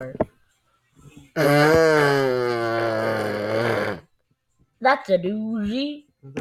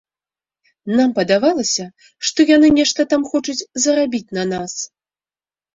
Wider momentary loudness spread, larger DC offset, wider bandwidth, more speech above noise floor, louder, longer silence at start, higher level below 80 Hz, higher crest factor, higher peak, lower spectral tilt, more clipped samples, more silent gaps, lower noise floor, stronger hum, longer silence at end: about the same, 14 LU vs 14 LU; neither; first, 15 kHz vs 7.8 kHz; second, 48 dB vs over 74 dB; second, -21 LUFS vs -16 LUFS; second, 0 s vs 0.85 s; about the same, -52 dBFS vs -54 dBFS; about the same, 20 dB vs 16 dB; about the same, -4 dBFS vs -2 dBFS; first, -6 dB/octave vs -3.5 dB/octave; neither; neither; second, -68 dBFS vs under -90 dBFS; neither; second, 0 s vs 0.9 s